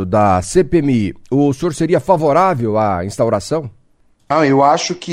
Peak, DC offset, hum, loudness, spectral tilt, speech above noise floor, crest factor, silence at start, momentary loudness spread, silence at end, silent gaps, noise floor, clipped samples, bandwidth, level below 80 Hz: 0 dBFS; under 0.1%; none; -15 LUFS; -6 dB/octave; 39 dB; 14 dB; 0 s; 7 LU; 0 s; none; -53 dBFS; under 0.1%; 15 kHz; -40 dBFS